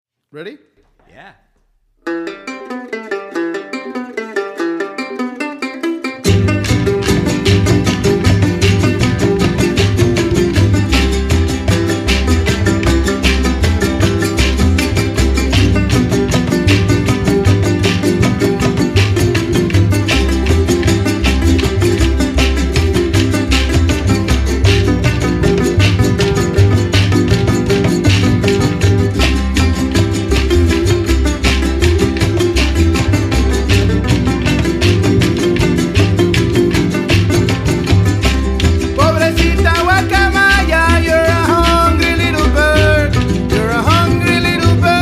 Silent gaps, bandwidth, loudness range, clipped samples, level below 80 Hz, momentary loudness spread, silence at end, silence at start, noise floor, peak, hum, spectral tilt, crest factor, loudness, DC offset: none; 15 kHz; 5 LU; under 0.1%; -20 dBFS; 8 LU; 0 s; 0.35 s; -57 dBFS; 0 dBFS; none; -5.5 dB/octave; 12 dB; -13 LUFS; under 0.1%